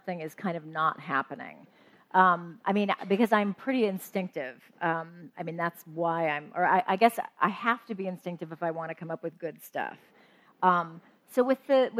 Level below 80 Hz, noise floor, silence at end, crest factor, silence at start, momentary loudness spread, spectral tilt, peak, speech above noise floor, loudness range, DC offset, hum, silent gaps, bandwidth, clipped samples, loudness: -84 dBFS; -60 dBFS; 0 s; 22 dB; 0.05 s; 14 LU; -6 dB/octave; -8 dBFS; 31 dB; 5 LU; under 0.1%; none; none; 16 kHz; under 0.1%; -29 LUFS